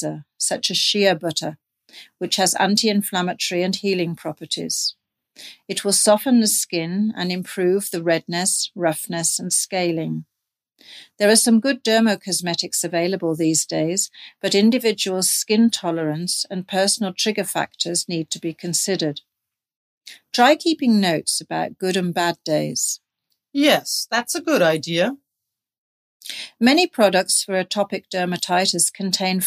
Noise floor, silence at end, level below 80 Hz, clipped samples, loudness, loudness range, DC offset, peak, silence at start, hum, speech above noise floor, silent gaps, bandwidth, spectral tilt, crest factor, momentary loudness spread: -83 dBFS; 0 s; -74 dBFS; under 0.1%; -20 LUFS; 3 LU; under 0.1%; -2 dBFS; 0 s; none; 63 dB; 19.76-20.01 s, 25.78-26.20 s; 15.5 kHz; -3 dB/octave; 20 dB; 10 LU